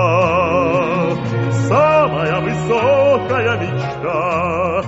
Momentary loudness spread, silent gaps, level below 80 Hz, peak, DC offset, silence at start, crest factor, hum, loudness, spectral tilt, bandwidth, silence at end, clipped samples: 7 LU; none; -44 dBFS; -2 dBFS; under 0.1%; 0 s; 14 dB; none; -16 LUFS; -5.5 dB/octave; 8 kHz; 0 s; under 0.1%